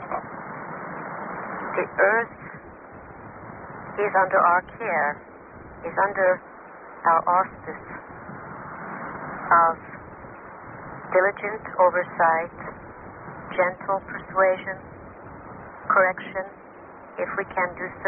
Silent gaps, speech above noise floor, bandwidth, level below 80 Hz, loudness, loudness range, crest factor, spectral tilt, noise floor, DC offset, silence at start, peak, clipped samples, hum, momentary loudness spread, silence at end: none; 21 dB; 3.3 kHz; -58 dBFS; -24 LUFS; 4 LU; 20 dB; 1.5 dB/octave; -44 dBFS; under 0.1%; 0 s; -6 dBFS; under 0.1%; none; 22 LU; 0 s